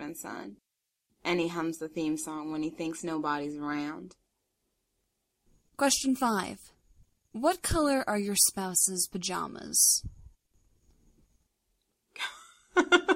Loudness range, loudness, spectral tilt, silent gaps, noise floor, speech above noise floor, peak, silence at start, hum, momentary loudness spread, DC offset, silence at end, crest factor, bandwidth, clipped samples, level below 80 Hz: 9 LU; -29 LUFS; -2.5 dB/octave; none; -79 dBFS; 50 dB; -8 dBFS; 0 s; none; 16 LU; under 0.1%; 0 s; 24 dB; 16 kHz; under 0.1%; -54 dBFS